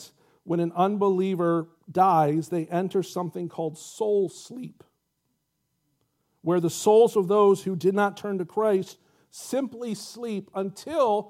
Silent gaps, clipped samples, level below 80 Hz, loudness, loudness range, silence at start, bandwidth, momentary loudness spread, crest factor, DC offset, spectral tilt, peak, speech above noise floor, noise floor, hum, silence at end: none; under 0.1%; -76 dBFS; -25 LUFS; 8 LU; 0 s; 15.5 kHz; 14 LU; 18 dB; under 0.1%; -6 dB/octave; -8 dBFS; 52 dB; -76 dBFS; none; 0.05 s